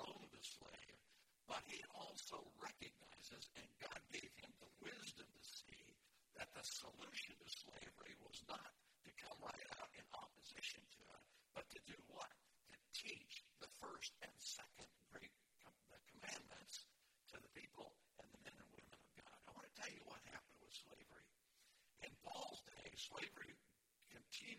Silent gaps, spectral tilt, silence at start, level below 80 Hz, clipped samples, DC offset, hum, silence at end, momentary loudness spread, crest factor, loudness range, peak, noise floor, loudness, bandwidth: none; -1.5 dB/octave; 0 s; -84 dBFS; under 0.1%; under 0.1%; none; 0 s; 14 LU; 24 dB; 5 LU; -36 dBFS; -79 dBFS; -56 LUFS; 16 kHz